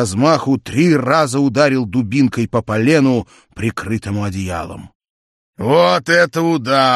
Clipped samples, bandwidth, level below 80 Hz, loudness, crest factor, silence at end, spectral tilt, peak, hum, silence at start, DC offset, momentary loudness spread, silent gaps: under 0.1%; 13 kHz; -48 dBFS; -15 LUFS; 14 dB; 0 s; -5.5 dB/octave; 0 dBFS; none; 0 s; under 0.1%; 11 LU; 4.95-5.00 s, 5.10-5.53 s